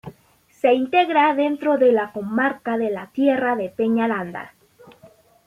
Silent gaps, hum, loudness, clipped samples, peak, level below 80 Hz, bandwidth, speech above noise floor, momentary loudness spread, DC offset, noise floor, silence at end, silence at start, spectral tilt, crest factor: none; none; -20 LUFS; under 0.1%; -4 dBFS; -66 dBFS; 14 kHz; 37 dB; 8 LU; under 0.1%; -57 dBFS; 0.4 s; 0.05 s; -6.5 dB/octave; 16 dB